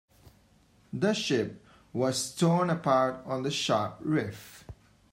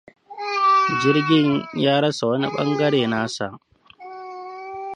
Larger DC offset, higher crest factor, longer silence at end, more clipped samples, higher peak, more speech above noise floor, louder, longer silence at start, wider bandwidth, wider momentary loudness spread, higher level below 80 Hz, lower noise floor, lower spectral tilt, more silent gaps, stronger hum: neither; about the same, 18 dB vs 16 dB; first, 0.4 s vs 0 s; neither; second, -12 dBFS vs -4 dBFS; first, 34 dB vs 21 dB; second, -29 LUFS vs -20 LUFS; first, 0.95 s vs 0.3 s; first, 16 kHz vs 10.5 kHz; second, 14 LU vs 18 LU; about the same, -64 dBFS vs -62 dBFS; first, -62 dBFS vs -41 dBFS; about the same, -5 dB/octave vs -5.5 dB/octave; neither; neither